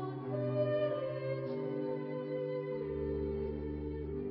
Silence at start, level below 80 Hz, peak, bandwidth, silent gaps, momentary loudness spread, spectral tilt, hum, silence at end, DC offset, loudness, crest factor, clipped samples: 0 s; -50 dBFS; -22 dBFS; 5.4 kHz; none; 7 LU; -7.5 dB/octave; none; 0 s; under 0.1%; -37 LUFS; 14 dB; under 0.1%